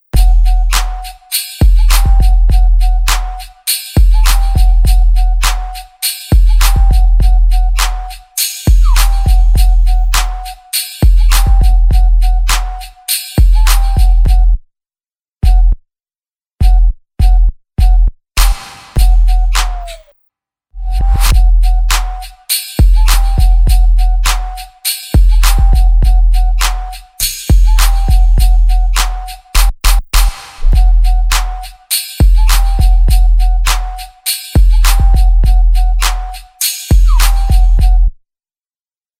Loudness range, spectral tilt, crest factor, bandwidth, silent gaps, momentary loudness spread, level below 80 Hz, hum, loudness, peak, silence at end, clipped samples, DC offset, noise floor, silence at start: 3 LU; -3.5 dB/octave; 8 dB; 16 kHz; 15.28-15.32 s; 8 LU; -8 dBFS; none; -13 LUFS; 0 dBFS; 1.05 s; under 0.1%; under 0.1%; under -90 dBFS; 0.15 s